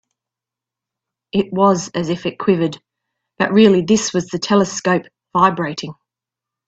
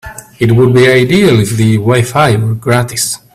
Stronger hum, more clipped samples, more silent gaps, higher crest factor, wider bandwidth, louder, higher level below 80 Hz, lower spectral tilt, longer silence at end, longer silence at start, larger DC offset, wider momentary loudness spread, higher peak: neither; neither; neither; first, 18 dB vs 10 dB; second, 8 kHz vs 15.5 kHz; second, -17 LUFS vs -9 LUFS; second, -56 dBFS vs -40 dBFS; about the same, -5 dB/octave vs -5.5 dB/octave; first, 0.75 s vs 0.2 s; first, 1.35 s vs 0.05 s; neither; first, 11 LU vs 7 LU; about the same, 0 dBFS vs 0 dBFS